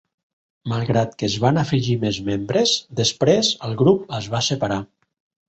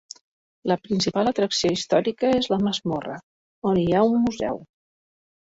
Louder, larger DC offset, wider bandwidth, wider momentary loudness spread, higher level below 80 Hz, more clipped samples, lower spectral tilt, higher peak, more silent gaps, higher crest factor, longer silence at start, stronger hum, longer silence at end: first, -20 LUFS vs -23 LUFS; neither; about the same, 8.2 kHz vs 8 kHz; second, 8 LU vs 15 LU; about the same, -52 dBFS vs -56 dBFS; neither; about the same, -5 dB/octave vs -5 dB/octave; first, -2 dBFS vs -6 dBFS; second, none vs 3.23-3.62 s; about the same, 18 dB vs 18 dB; about the same, 0.65 s vs 0.65 s; neither; second, 0.65 s vs 0.95 s